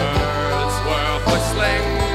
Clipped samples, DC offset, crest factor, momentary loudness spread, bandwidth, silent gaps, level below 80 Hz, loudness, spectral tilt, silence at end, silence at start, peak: under 0.1%; under 0.1%; 14 dB; 2 LU; 15.5 kHz; none; -26 dBFS; -19 LUFS; -4.5 dB/octave; 0 s; 0 s; -6 dBFS